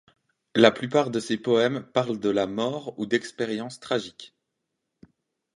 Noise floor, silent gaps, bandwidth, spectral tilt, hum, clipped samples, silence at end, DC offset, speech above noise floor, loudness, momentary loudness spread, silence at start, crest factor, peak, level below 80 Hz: -81 dBFS; none; 11.5 kHz; -5 dB/octave; none; under 0.1%; 1.3 s; under 0.1%; 56 dB; -25 LUFS; 11 LU; 0.55 s; 24 dB; -2 dBFS; -68 dBFS